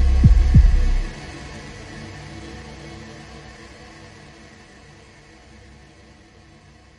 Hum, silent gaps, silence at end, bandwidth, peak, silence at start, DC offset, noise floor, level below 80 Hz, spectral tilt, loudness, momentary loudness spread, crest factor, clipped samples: none; none; 3.85 s; 10 kHz; -2 dBFS; 0 s; under 0.1%; -48 dBFS; -22 dBFS; -7 dB/octave; -18 LUFS; 28 LU; 20 dB; under 0.1%